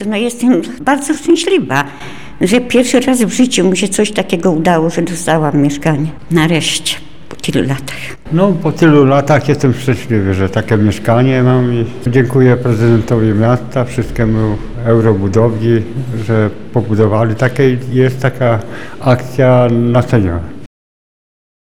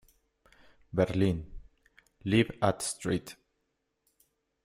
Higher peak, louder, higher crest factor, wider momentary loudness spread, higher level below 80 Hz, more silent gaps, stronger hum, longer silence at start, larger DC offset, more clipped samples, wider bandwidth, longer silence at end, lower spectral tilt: first, 0 dBFS vs -10 dBFS; first, -12 LUFS vs -30 LUFS; second, 12 dB vs 22 dB; second, 8 LU vs 13 LU; first, -36 dBFS vs -54 dBFS; neither; neither; second, 0 s vs 0.95 s; first, 4% vs under 0.1%; neither; about the same, 15.5 kHz vs 16 kHz; second, 1 s vs 1.3 s; about the same, -6 dB/octave vs -5.5 dB/octave